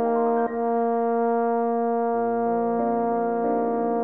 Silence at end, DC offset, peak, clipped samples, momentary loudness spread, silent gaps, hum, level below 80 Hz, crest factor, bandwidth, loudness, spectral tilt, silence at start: 0 s; 0.3%; -12 dBFS; under 0.1%; 1 LU; none; none; -68 dBFS; 12 dB; 3 kHz; -24 LUFS; -11 dB/octave; 0 s